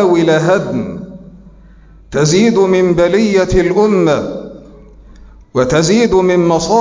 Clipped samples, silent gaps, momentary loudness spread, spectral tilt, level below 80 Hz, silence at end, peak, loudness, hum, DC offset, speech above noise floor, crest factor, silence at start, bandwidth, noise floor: under 0.1%; none; 13 LU; -5.5 dB/octave; -34 dBFS; 0 s; -2 dBFS; -12 LUFS; none; under 0.1%; 29 dB; 12 dB; 0 s; 7.6 kHz; -40 dBFS